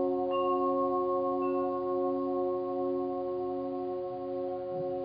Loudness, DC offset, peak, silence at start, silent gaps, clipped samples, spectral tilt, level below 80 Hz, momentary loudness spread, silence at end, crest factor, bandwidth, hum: -32 LUFS; under 0.1%; -20 dBFS; 0 s; none; under 0.1%; -6.5 dB/octave; -66 dBFS; 7 LU; 0 s; 12 dB; 5 kHz; none